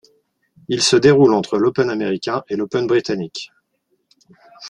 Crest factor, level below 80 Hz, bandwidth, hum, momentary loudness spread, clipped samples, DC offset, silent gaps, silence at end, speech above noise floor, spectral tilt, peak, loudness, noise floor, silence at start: 18 dB; -56 dBFS; 11 kHz; none; 13 LU; under 0.1%; under 0.1%; none; 0 s; 52 dB; -4.5 dB/octave; 0 dBFS; -17 LUFS; -68 dBFS; 0.7 s